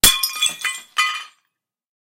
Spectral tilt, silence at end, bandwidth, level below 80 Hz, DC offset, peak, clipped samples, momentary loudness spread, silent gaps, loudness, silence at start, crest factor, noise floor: 1 dB/octave; 0.85 s; 17 kHz; -40 dBFS; under 0.1%; 0 dBFS; under 0.1%; 9 LU; none; -19 LUFS; 0.05 s; 22 dB; -76 dBFS